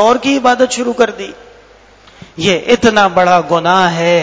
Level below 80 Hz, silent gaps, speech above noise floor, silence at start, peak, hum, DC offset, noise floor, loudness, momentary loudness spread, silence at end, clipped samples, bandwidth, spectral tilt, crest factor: -46 dBFS; none; 31 dB; 0 s; 0 dBFS; none; under 0.1%; -42 dBFS; -11 LUFS; 6 LU; 0 s; 0.4%; 8 kHz; -4 dB/octave; 12 dB